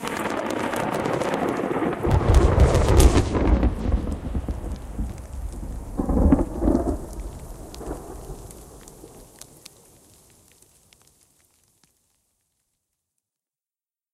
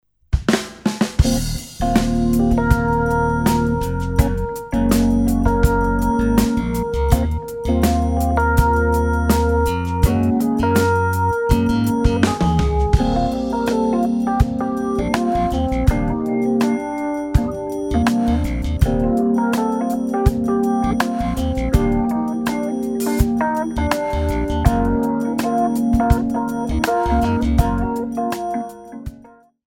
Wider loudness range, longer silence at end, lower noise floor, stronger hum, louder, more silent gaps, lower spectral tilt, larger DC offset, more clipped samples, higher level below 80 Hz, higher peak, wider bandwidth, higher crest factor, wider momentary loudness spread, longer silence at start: first, 20 LU vs 2 LU; first, 4.9 s vs 0.45 s; first, under -90 dBFS vs -46 dBFS; neither; second, -23 LUFS vs -19 LUFS; neither; about the same, -6.5 dB/octave vs -7 dB/octave; neither; neither; about the same, -28 dBFS vs -24 dBFS; about the same, 0 dBFS vs 0 dBFS; second, 14.5 kHz vs 18.5 kHz; first, 24 dB vs 18 dB; first, 24 LU vs 5 LU; second, 0 s vs 0.3 s